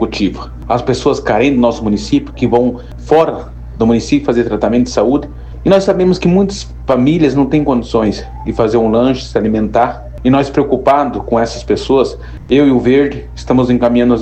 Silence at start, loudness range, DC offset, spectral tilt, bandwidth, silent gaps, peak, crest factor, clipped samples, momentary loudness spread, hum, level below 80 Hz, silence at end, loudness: 0 s; 1 LU; under 0.1%; -7 dB/octave; 8.6 kHz; none; 0 dBFS; 12 dB; under 0.1%; 7 LU; none; -30 dBFS; 0 s; -13 LUFS